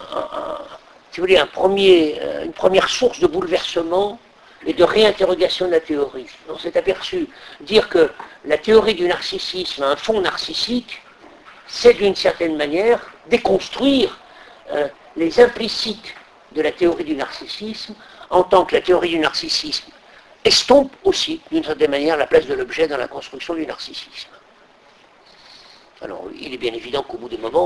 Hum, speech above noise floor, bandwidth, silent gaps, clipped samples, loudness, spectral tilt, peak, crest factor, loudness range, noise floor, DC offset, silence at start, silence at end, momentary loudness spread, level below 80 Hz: none; 32 dB; 11 kHz; none; under 0.1%; -18 LUFS; -3.5 dB/octave; 0 dBFS; 18 dB; 6 LU; -50 dBFS; under 0.1%; 0 s; 0 s; 17 LU; -48 dBFS